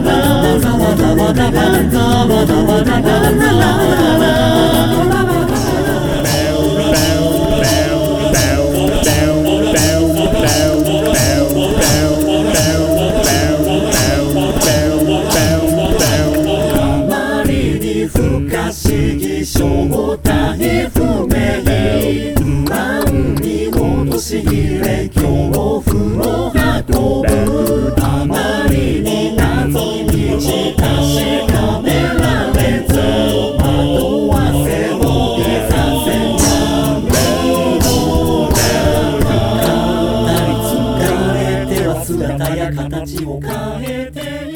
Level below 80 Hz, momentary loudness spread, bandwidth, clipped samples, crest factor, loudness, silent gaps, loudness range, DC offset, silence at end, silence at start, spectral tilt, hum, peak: -24 dBFS; 5 LU; over 20 kHz; under 0.1%; 12 dB; -13 LUFS; none; 4 LU; under 0.1%; 0 s; 0 s; -5 dB/octave; none; 0 dBFS